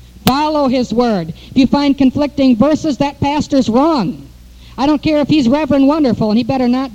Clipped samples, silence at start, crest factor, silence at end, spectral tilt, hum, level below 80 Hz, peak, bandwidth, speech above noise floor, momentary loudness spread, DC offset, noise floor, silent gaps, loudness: under 0.1%; 0.25 s; 14 dB; 0 s; -6.5 dB/octave; none; -38 dBFS; 0 dBFS; 19 kHz; 25 dB; 6 LU; under 0.1%; -37 dBFS; none; -13 LUFS